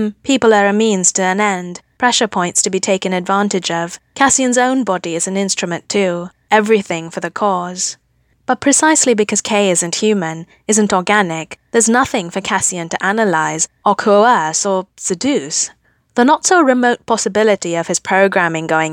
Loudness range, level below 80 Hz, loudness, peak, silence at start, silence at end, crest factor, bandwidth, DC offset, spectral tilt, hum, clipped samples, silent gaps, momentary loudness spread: 2 LU; -56 dBFS; -14 LUFS; 0 dBFS; 0 s; 0 s; 14 dB; 19 kHz; under 0.1%; -3 dB/octave; none; under 0.1%; none; 9 LU